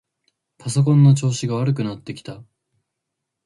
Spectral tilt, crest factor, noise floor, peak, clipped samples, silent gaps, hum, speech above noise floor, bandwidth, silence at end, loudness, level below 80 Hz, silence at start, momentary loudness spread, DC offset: -7 dB/octave; 16 dB; -80 dBFS; -4 dBFS; under 0.1%; none; none; 62 dB; 11.5 kHz; 1.05 s; -18 LUFS; -60 dBFS; 0.65 s; 20 LU; under 0.1%